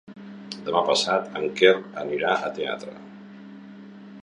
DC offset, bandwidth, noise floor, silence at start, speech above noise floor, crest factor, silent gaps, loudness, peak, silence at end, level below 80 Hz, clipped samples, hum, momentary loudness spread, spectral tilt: under 0.1%; 11 kHz; -43 dBFS; 0.1 s; 20 dB; 22 dB; none; -23 LUFS; -4 dBFS; 0 s; -70 dBFS; under 0.1%; none; 25 LU; -3.5 dB/octave